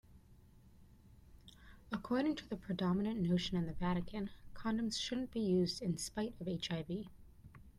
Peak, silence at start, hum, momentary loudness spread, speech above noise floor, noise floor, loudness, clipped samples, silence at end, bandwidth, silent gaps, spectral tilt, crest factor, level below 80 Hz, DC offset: -24 dBFS; 0.1 s; none; 10 LU; 25 dB; -62 dBFS; -39 LUFS; under 0.1%; 0.05 s; 13 kHz; none; -5.5 dB/octave; 16 dB; -58 dBFS; under 0.1%